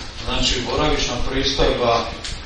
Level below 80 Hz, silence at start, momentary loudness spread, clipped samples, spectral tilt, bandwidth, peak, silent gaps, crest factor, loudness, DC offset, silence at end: -28 dBFS; 0 s; 4 LU; under 0.1%; -3.5 dB/octave; 9.8 kHz; -4 dBFS; none; 16 dB; -20 LUFS; under 0.1%; 0 s